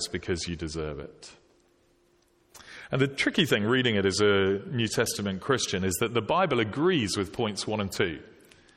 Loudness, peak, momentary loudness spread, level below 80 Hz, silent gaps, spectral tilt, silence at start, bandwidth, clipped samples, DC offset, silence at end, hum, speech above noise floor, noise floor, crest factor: -27 LUFS; -10 dBFS; 10 LU; -54 dBFS; none; -4.5 dB/octave; 0 s; 16.5 kHz; under 0.1%; under 0.1%; 0.55 s; none; 38 dB; -65 dBFS; 20 dB